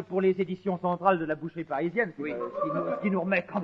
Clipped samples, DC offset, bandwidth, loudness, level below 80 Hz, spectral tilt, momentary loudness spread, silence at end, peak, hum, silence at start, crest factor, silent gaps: under 0.1%; under 0.1%; 5.8 kHz; -29 LUFS; -70 dBFS; -9.5 dB/octave; 7 LU; 0 s; -8 dBFS; none; 0 s; 20 dB; none